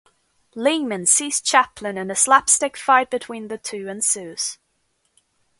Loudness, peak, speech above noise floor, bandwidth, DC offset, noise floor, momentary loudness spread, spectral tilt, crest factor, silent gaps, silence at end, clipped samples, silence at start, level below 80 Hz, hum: -19 LUFS; 0 dBFS; 48 dB; 12 kHz; under 0.1%; -69 dBFS; 14 LU; -1 dB/octave; 22 dB; none; 1.05 s; under 0.1%; 0.55 s; -64 dBFS; none